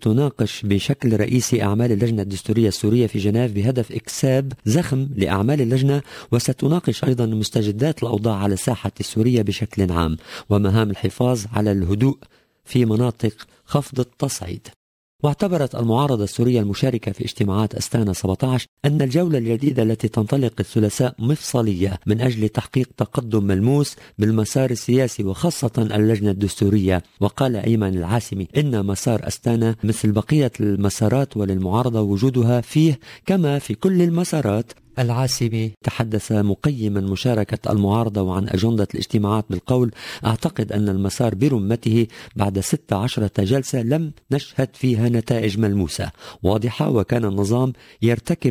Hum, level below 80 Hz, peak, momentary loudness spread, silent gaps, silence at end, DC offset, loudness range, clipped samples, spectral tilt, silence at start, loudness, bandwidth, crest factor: none; -40 dBFS; -2 dBFS; 5 LU; 14.76-15.19 s, 18.68-18.77 s, 35.77-35.81 s; 0 s; under 0.1%; 2 LU; under 0.1%; -6.5 dB/octave; 0 s; -20 LUFS; 16 kHz; 16 dB